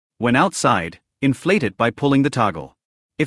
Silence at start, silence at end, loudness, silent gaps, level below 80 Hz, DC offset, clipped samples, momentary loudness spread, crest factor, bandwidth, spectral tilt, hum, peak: 0.2 s; 0 s; -19 LUFS; 2.85-3.09 s; -54 dBFS; under 0.1%; under 0.1%; 6 LU; 16 dB; 12 kHz; -5.5 dB/octave; none; -4 dBFS